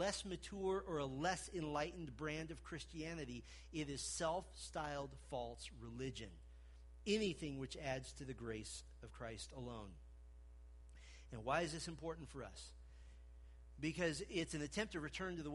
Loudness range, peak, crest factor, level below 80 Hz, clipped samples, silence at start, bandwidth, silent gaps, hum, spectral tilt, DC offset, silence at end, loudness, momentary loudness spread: 4 LU; -26 dBFS; 22 dB; -60 dBFS; under 0.1%; 0 s; 11.5 kHz; none; none; -4 dB/octave; under 0.1%; 0 s; -46 LUFS; 21 LU